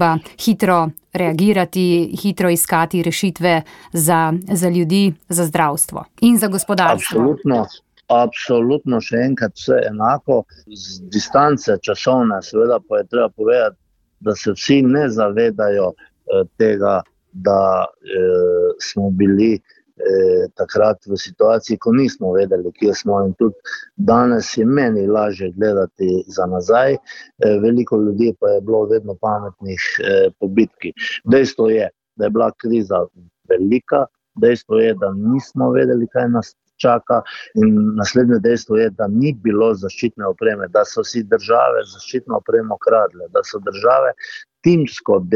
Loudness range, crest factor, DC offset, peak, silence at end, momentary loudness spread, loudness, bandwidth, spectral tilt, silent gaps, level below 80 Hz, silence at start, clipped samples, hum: 1 LU; 14 dB; under 0.1%; -2 dBFS; 0 s; 7 LU; -17 LUFS; 17 kHz; -5.5 dB/octave; none; -56 dBFS; 0 s; under 0.1%; none